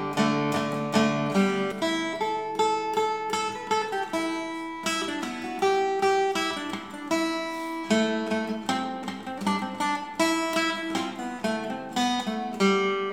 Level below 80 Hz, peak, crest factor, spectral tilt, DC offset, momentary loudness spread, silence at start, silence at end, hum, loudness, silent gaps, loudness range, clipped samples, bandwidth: -66 dBFS; -10 dBFS; 18 dB; -4.5 dB/octave; 0.1%; 8 LU; 0 s; 0 s; none; -27 LUFS; none; 2 LU; under 0.1%; 18 kHz